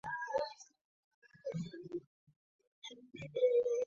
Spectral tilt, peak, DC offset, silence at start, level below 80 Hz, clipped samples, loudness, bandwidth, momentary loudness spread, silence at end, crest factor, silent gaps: -4 dB/octave; -22 dBFS; under 0.1%; 0.05 s; -78 dBFS; under 0.1%; -38 LUFS; 7.4 kHz; 20 LU; 0 s; 18 dB; 0.81-1.22 s, 2.07-2.27 s, 2.36-2.59 s, 2.67-2.82 s